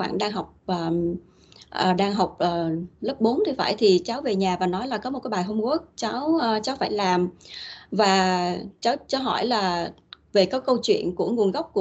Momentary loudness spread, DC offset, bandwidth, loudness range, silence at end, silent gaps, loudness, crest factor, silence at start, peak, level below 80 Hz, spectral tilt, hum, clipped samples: 9 LU; under 0.1%; 8.2 kHz; 2 LU; 0 s; none; -24 LUFS; 18 dB; 0 s; -6 dBFS; -58 dBFS; -5 dB/octave; none; under 0.1%